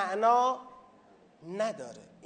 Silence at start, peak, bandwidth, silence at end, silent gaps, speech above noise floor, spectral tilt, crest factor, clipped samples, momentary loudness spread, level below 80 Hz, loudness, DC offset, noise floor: 0 s; -14 dBFS; 9.4 kHz; 0.25 s; none; 31 dB; -4 dB/octave; 18 dB; under 0.1%; 18 LU; -82 dBFS; -29 LUFS; under 0.1%; -60 dBFS